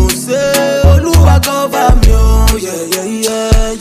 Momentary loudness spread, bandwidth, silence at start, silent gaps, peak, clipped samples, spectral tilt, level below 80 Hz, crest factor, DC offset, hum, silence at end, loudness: 8 LU; 16 kHz; 0 s; none; 0 dBFS; 0.5%; -5 dB/octave; -12 dBFS; 8 dB; under 0.1%; none; 0 s; -11 LUFS